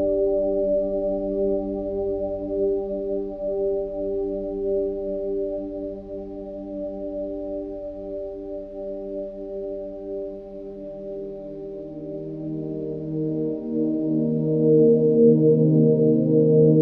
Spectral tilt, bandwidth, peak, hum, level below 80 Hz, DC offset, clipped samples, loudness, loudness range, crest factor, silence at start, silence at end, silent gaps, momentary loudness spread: -13.5 dB/octave; 1.9 kHz; -6 dBFS; none; -46 dBFS; under 0.1%; under 0.1%; -24 LUFS; 14 LU; 18 dB; 0 s; 0 s; none; 17 LU